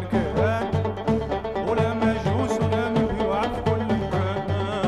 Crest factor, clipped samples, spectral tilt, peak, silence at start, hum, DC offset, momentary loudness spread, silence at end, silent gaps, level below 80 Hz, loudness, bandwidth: 14 dB; under 0.1%; -7.5 dB/octave; -10 dBFS; 0 s; none; under 0.1%; 3 LU; 0 s; none; -40 dBFS; -24 LUFS; 11.5 kHz